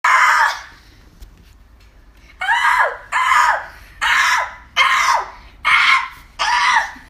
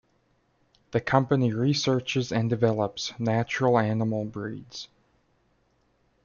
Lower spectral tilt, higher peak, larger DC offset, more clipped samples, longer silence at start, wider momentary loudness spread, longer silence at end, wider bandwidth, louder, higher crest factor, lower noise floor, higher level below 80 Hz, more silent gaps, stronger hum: second, 1 dB/octave vs -6 dB/octave; first, 0 dBFS vs -6 dBFS; neither; neither; second, 0.05 s vs 0.95 s; about the same, 11 LU vs 13 LU; second, 0.1 s vs 1.4 s; first, 15.5 kHz vs 7.2 kHz; first, -15 LUFS vs -26 LUFS; about the same, 16 dB vs 20 dB; second, -46 dBFS vs -68 dBFS; first, -46 dBFS vs -62 dBFS; neither; neither